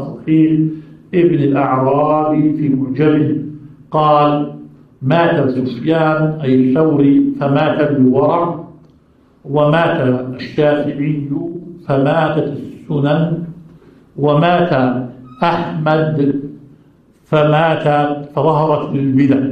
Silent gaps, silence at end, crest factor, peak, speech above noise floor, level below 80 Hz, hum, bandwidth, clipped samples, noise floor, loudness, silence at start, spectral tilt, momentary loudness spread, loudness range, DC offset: none; 0 s; 14 dB; 0 dBFS; 37 dB; -54 dBFS; none; 5.4 kHz; under 0.1%; -50 dBFS; -14 LUFS; 0 s; -9.5 dB/octave; 10 LU; 4 LU; under 0.1%